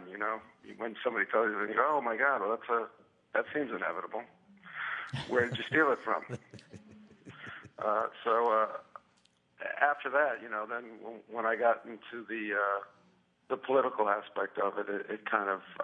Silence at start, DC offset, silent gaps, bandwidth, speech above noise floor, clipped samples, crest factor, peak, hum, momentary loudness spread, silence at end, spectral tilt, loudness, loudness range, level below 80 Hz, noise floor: 0 s; under 0.1%; none; 10 kHz; 37 dB; under 0.1%; 22 dB; -12 dBFS; none; 16 LU; 0 s; -6 dB/octave; -32 LUFS; 3 LU; -80 dBFS; -70 dBFS